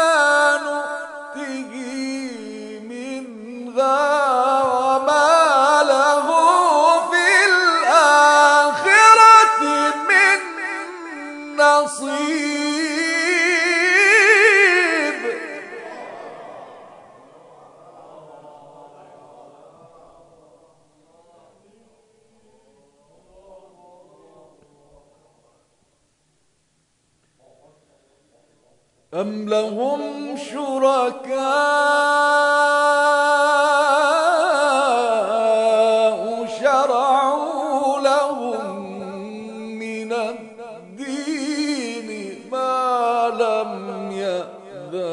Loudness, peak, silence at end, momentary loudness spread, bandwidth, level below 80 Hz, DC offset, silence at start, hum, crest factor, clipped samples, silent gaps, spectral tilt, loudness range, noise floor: -16 LUFS; 0 dBFS; 0 s; 20 LU; 11 kHz; -74 dBFS; under 0.1%; 0 s; none; 18 dB; under 0.1%; none; -2 dB/octave; 15 LU; -65 dBFS